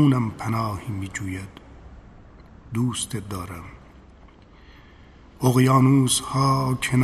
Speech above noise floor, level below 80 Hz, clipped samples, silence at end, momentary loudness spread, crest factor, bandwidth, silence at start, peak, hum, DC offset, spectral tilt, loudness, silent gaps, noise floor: 27 dB; -48 dBFS; under 0.1%; 0 s; 18 LU; 18 dB; 14 kHz; 0 s; -4 dBFS; none; under 0.1%; -5.5 dB/octave; -22 LUFS; none; -49 dBFS